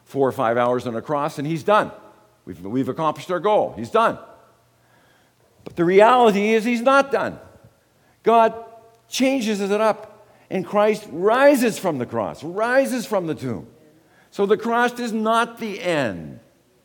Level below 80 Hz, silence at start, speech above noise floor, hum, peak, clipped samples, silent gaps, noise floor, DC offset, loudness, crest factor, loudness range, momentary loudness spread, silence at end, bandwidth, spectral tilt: -64 dBFS; 0.15 s; 39 dB; none; -2 dBFS; under 0.1%; none; -59 dBFS; under 0.1%; -20 LUFS; 20 dB; 4 LU; 13 LU; 0.45 s; 19 kHz; -5 dB/octave